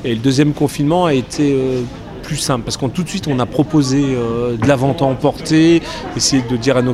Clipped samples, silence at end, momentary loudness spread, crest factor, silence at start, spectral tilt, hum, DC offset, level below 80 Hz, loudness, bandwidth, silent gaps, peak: under 0.1%; 0 s; 7 LU; 14 dB; 0 s; -5.5 dB/octave; none; under 0.1%; -38 dBFS; -15 LUFS; 15 kHz; none; -2 dBFS